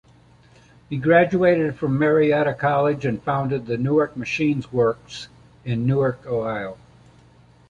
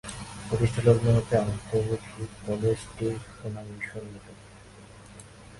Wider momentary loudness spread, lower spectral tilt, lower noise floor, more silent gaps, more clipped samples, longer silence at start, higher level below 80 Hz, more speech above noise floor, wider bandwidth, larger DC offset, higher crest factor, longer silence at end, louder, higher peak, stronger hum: second, 14 LU vs 25 LU; about the same, -7.5 dB/octave vs -7 dB/octave; about the same, -52 dBFS vs -49 dBFS; neither; neither; first, 0.9 s vs 0.05 s; second, -54 dBFS vs -48 dBFS; first, 32 dB vs 22 dB; second, 9.2 kHz vs 11.5 kHz; neither; about the same, 18 dB vs 22 dB; first, 0.95 s vs 0 s; first, -21 LUFS vs -28 LUFS; first, -4 dBFS vs -8 dBFS; neither